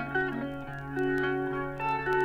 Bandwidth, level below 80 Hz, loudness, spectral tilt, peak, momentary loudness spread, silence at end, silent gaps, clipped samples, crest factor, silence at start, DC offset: 13.5 kHz; -52 dBFS; -31 LUFS; -7.5 dB/octave; -18 dBFS; 8 LU; 0 s; none; under 0.1%; 14 dB; 0 s; under 0.1%